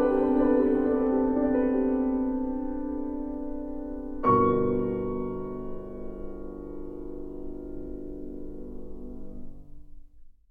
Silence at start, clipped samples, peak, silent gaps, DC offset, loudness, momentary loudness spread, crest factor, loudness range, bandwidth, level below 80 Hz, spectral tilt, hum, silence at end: 0 s; under 0.1%; -10 dBFS; none; under 0.1%; -27 LUFS; 18 LU; 18 dB; 15 LU; 3.6 kHz; -44 dBFS; -11 dB/octave; 50 Hz at -50 dBFS; 0.2 s